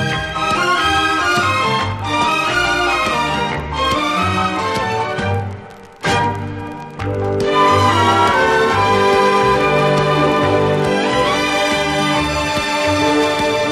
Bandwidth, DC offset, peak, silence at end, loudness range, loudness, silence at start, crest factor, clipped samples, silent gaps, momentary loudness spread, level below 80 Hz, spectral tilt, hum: 15 kHz; under 0.1%; -2 dBFS; 0 s; 5 LU; -15 LUFS; 0 s; 14 dB; under 0.1%; none; 8 LU; -38 dBFS; -4.5 dB/octave; none